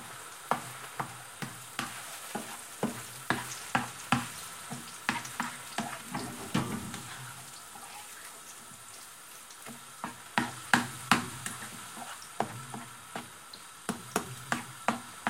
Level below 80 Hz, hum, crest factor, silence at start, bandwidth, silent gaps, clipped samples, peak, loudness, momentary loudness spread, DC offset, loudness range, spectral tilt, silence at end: -66 dBFS; none; 32 dB; 0 s; 17 kHz; none; under 0.1%; -4 dBFS; -36 LUFS; 15 LU; under 0.1%; 7 LU; -3 dB/octave; 0 s